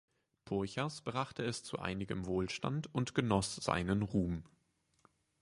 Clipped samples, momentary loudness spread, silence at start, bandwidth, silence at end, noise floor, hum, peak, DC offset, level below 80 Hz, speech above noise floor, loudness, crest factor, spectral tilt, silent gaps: under 0.1%; 6 LU; 0.45 s; 11.5 kHz; 0.95 s; -77 dBFS; none; -16 dBFS; under 0.1%; -56 dBFS; 41 dB; -37 LUFS; 22 dB; -5.5 dB/octave; none